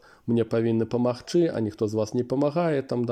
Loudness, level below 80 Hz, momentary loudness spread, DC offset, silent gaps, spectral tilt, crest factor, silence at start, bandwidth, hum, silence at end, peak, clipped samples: -25 LUFS; -64 dBFS; 3 LU; under 0.1%; none; -7.5 dB/octave; 14 dB; 0.25 s; 10 kHz; none; 0 s; -12 dBFS; under 0.1%